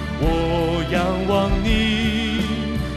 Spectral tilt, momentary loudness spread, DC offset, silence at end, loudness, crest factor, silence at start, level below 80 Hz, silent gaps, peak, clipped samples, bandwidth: -6 dB/octave; 3 LU; under 0.1%; 0 s; -20 LUFS; 14 dB; 0 s; -28 dBFS; none; -6 dBFS; under 0.1%; 14 kHz